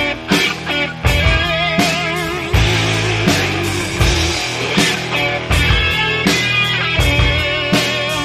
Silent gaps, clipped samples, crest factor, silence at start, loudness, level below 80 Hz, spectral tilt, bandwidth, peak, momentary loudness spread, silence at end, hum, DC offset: none; under 0.1%; 16 dB; 0 s; -15 LUFS; -24 dBFS; -4 dB/octave; 14 kHz; 0 dBFS; 4 LU; 0 s; none; under 0.1%